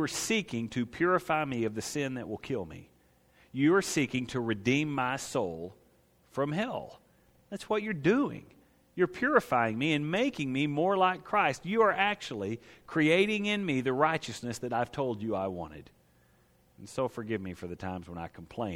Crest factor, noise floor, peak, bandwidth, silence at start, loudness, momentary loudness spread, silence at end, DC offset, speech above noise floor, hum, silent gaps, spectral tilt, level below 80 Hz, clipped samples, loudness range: 22 dB; -65 dBFS; -10 dBFS; 16.5 kHz; 0 s; -30 LUFS; 15 LU; 0 s; under 0.1%; 35 dB; none; none; -5 dB/octave; -64 dBFS; under 0.1%; 8 LU